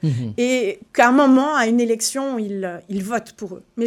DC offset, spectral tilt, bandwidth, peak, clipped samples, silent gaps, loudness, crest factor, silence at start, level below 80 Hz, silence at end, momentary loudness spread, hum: under 0.1%; -5 dB/octave; 15.5 kHz; 0 dBFS; under 0.1%; none; -19 LUFS; 18 dB; 0.05 s; -64 dBFS; 0 s; 14 LU; none